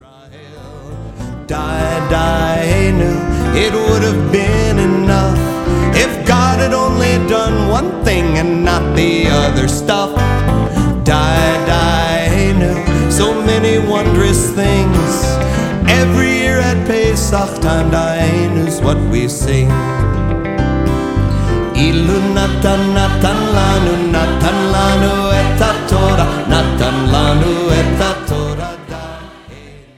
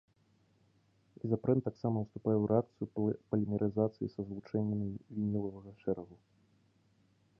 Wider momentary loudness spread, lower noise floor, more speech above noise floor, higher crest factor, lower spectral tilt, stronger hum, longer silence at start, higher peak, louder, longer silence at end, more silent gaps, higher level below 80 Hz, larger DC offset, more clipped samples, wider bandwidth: second, 4 LU vs 9 LU; second, -37 dBFS vs -71 dBFS; second, 25 dB vs 37 dB; second, 12 dB vs 20 dB; second, -5.5 dB/octave vs -12 dB/octave; neither; second, 0.3 s vs 1.25 s; first, 0 dBFS vs -16 dBFS; first, -13 LUFS vs -35 LUFS; second, 0.2 s vs 1.25 s; neither; first, -20 dBFS vs -64 dBFS; neither; neither; first, 16.5 kHz vs 5.8 kHz